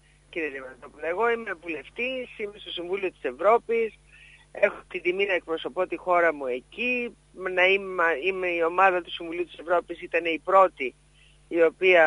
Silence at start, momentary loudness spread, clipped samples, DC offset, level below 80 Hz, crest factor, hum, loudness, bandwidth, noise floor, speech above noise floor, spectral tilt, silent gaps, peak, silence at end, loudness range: 0.3 s; 13 LU; under 0.1%; under 0.1%; -60 dBFS; 20 dB; none; -26 LUFS; 11 kHz; -57 dBFS; 32 dB; -5 dB/octave; none; -6 dBFS; 0 s; 4 LU